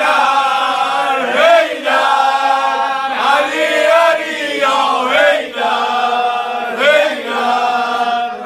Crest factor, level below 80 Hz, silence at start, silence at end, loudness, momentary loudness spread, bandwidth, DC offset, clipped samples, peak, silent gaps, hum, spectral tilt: 14 dB; -68 dBFS; 0 s; 0 s; -13 LUFS; 6 LU; 14.5 kHz; under 0.1%; under 0.1%; 0 dBFS; none; none; -1.5 dB/octave